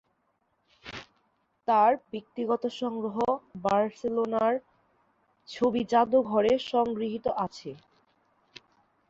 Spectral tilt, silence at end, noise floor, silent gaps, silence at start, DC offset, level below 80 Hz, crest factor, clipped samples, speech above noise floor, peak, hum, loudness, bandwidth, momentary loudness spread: -6 dB/octave; 1.35 s; -74 dBFS; none; 0.85 s; under 0.1%; -66 dBFS; 18 dB; under 0.1%; 47 dB; -10 dBFS; none; -27 LUFS; 7.8 kHz; 19 LU